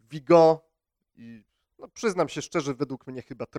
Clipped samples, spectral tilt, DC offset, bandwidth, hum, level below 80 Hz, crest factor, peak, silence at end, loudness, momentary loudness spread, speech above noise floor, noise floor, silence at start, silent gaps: under 0.1%; -6 dB/octave; under 0.1%; 11 kHz; none; -66 dBFS; 20 dB; -6 dBFS; 0 s; -24 LUFS; 20 LU; 54 dB; -79 dBFS; 0.1 s; none